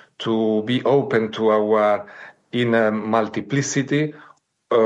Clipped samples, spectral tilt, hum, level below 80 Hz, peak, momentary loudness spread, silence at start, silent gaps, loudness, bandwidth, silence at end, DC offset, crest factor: under 0.1%; -5.5 dB/octave; none; -72 dBFS; -6 dBFS; 6 LU; 0.2 s; none; -20 LUFS; 9.2 kHz; 0 s; under 0.1%; 14 dB